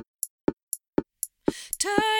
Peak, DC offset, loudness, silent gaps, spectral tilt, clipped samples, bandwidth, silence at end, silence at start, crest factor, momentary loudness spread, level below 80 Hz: -6 dBFS; under 0.1%; -30 LUFS; 0.30-0.39 s, 0.53-0.57 s, 0.63-0.67 s; -2.5 dB/octave; under 0.1%; 19 kHz; 0 s; 0.25 s; 24 dB; 11 LU; -56 dBFS